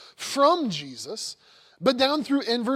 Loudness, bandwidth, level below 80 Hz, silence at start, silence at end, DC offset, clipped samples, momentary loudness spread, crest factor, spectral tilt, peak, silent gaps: -24 LUFS; 15.5 kHz; -70 dBFS; 0 s; 0 s; under 0.1%; under 0.1%; 13 LU; 18 dB; -3.5 dB/octave; -6 dBFS; none